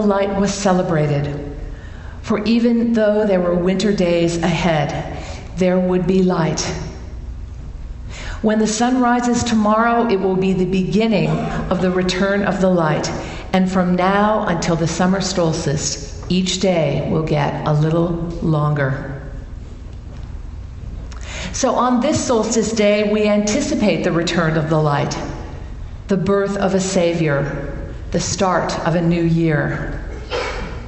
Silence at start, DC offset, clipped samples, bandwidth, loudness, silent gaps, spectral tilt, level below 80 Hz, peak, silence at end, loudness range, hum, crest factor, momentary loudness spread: 0 s; under 0.1%; under 0.1%; 8.4 kHz; -18 LUFS; none; -5.5 dB/octave; -34 dBFS; 0 dBFS; 0 s; 4 LU; none; 18 dB; 17 LU